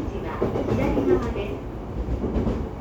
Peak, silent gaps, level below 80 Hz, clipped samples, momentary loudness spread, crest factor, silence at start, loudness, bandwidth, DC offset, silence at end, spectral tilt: -8 dBFS; none; -32 dBFS; under 0.1%; 10 LU; 16 dB; 0 s; -26 LUFS; 17.5 kHz; under 0.1%; 0 s; -8.5 dB/octave